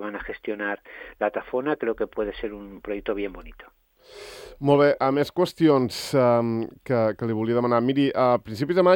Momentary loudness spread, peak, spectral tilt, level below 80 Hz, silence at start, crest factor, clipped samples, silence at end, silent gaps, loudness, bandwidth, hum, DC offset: 15 LU; -6 dBFS; -6.5 dB/octave; -52 dBFS; 0 s; 18 dB; under 0.1%; 0 s; none; -24 LUFS; 18 kHz; none; under 0.1%